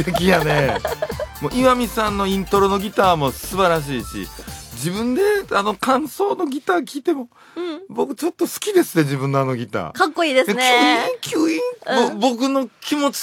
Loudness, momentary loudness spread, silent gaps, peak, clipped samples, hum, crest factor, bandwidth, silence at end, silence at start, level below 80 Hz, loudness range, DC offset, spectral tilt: -19 LUFS; 10 LU; none; 0 dBFS; under 0.1%; none; 18 dB; 17 kHz; 0 s; 0 s; -42 dBFS; 4 LU; under 0.1%; -4.5 dB/octave